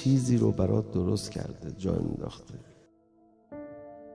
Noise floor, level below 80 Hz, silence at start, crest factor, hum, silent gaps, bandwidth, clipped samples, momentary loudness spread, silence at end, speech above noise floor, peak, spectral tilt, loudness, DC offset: -62 dBFS; -52 dBFS; 0 s; 18 dB; none; none; 11 kHz; under 0.1%; 21 LU; 0 s; 34 dB; -12 dBFS; -7.5 dB/octave; -29 LUFS; under 0.1%